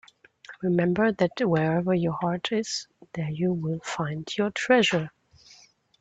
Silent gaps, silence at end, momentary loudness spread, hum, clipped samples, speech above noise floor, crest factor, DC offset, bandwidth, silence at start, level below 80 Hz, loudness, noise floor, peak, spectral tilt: none; 0.9 s; 11 LU; none; under 0.1%; 31 dB; 20 dB; under 0.1%; 8.2 kHz; 0.5 s; -64 dBFS; -26 LUFS; -56 dBFS; -6 dBFS; -5.5 dB/octave